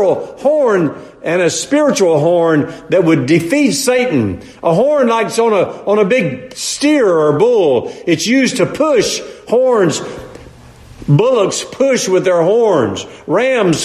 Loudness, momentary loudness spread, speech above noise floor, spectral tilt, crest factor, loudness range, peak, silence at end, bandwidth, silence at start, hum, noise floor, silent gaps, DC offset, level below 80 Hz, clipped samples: -13 LUFS; 8 LU; 25 dB; -5 dB/octave; 12 dB; 2 LU; 0 dBFS; 0 s; 14 kHz; 0 s; none; -38 dBFS; none; under 0.1%; -48 dBFS; under 0.1%